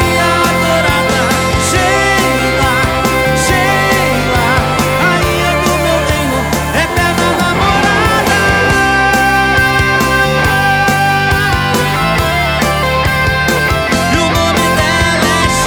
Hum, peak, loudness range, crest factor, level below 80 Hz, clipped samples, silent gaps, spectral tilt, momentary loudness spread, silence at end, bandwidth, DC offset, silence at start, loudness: none; 0 dBFS; 2 LU; 10 dB; -24 dBFS; under 0.1%; none; -4 dB/octave; 2 LU; 0 s; over 20 kHz; under 0.1%; 0 s; -11 LUFS